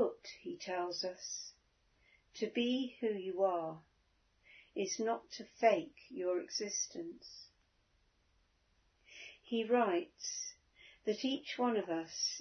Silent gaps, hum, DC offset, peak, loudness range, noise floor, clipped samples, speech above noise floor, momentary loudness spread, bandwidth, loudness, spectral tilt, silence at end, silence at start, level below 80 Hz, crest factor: none; none; under 0.1%; -16 dBFS; 5 LU; -75 dBFS; under 0.1%; 38 dB; 19 LU; 6.4 kHz; -38 LUFS; -2.5 dB/octave; 0 s; 0 s; -80 dBFS; 24 dB